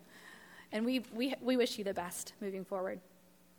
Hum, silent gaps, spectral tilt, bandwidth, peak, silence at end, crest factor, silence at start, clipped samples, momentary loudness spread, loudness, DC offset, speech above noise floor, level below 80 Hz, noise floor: none; none; -4 dB/octave; 19.5 kHz; -20 dBFS; 0.6 s; 18 dB; 0 s; under 0.1%; 21 LU; -37 LUFS; under 0.1%; 20 dB; -78 dBFS; -56 dBFS